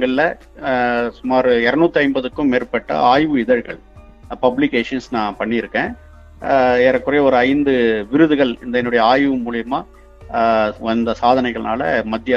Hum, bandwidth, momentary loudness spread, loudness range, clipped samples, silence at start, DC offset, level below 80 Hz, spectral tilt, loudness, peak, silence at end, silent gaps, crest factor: none; 7.4 kHz; 8 LU; 3 LU; under 0.1%; 0 s; under 0.1%; -44 dBFS; -6.5 dB/octave; -17 LUFS; 0 dBFS; 0 s; none; 16 dB